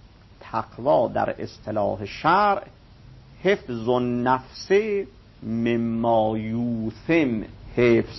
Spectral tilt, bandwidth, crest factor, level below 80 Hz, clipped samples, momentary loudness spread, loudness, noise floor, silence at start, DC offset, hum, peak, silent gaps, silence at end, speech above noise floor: -7 dB/octave; 6 kHz; 18 dB; -50 dBFS; under 0.1%; 11 LU; -24 LUFS; -47 dBFS; 0.4 s; under 0.1%; none; -6 dBFS; none; 0 s; 25 dB